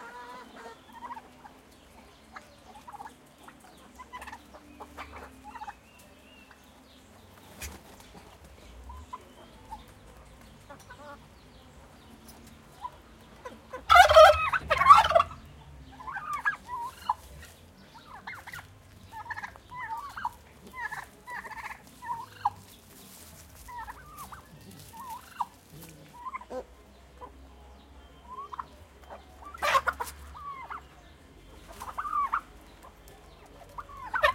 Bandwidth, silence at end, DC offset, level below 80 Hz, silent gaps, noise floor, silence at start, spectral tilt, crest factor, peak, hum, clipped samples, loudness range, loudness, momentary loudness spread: 16.5 kHz; 0 s; under 0.1%; -54 dBFS; none; -55 dBFS; 0 s; -2.5 dB/octave; 28 dB; -4 dBFS; none; under 0.1%; 28 LU; -25 LUFS; 24 LU